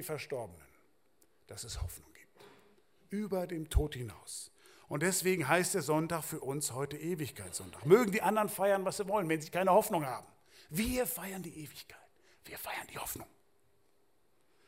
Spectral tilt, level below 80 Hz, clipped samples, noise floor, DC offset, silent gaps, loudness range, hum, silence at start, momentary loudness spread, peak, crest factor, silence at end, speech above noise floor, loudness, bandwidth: -4.5 dB/octave; -50 dBFS; under 0.1%; -75 dBFS; under 0.1%; none; 13 LU; none; 0 s; 17 LU; -10 dBFS; 24 dB; 1.4 s; 41 dB; -34 LUFS; 16 kHz